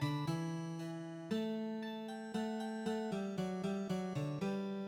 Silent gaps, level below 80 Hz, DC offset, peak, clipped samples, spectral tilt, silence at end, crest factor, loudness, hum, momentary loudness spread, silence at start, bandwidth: none; -74 dBFS; under 0.1%; -26 dBFS; under 0.1%; -6.5 dB/octave; 0 s; 14 dB; -41 LUFS; none; 5 LU; 0 s; 16.5 kHz